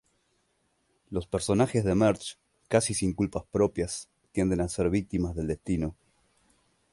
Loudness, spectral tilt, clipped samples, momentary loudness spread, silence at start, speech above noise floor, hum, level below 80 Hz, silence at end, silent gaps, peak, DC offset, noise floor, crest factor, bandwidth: -28 LUFS; -5.5 dB/octave; under 0.1%; 11 LU; 1.1 s; 45 dB; none; -46 dBFS; 1 s; none; -10 dBFS; under 0.1%; -73 dBFS; 20 dB; 11.5 kHz